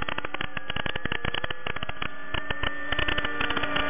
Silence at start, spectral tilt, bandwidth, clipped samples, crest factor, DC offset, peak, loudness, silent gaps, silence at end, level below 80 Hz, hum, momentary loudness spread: 0 s; -7.5 dB/octave; 3.7 kHz; under 0.1%; 20 dB; 4%; -10 dBFS; -30 LUFS; none; 0 s; -44 dBFS; none; 7 LU